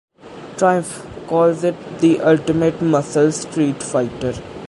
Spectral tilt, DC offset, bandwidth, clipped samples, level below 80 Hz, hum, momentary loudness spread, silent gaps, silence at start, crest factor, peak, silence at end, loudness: -6 dB/octave; under 0.1%; 11.5 kHz; under 0.1%; -50 dBFS; none; 10 LU; none; 0.25 s; 16 dB; -2 dBFS; 0 s; -18 LUFS